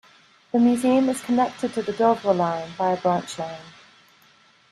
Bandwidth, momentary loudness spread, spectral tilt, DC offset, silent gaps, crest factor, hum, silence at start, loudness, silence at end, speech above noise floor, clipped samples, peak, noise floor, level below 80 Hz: 13 kHz; 11 LU; -6 dB/octave; under 0.1%; none; 18 dB; none; 0.55 s; -22 LUFS; 1 s; 35 dB; under 0.1%; -6 dBFS; -56 dBFS; -66 dBFS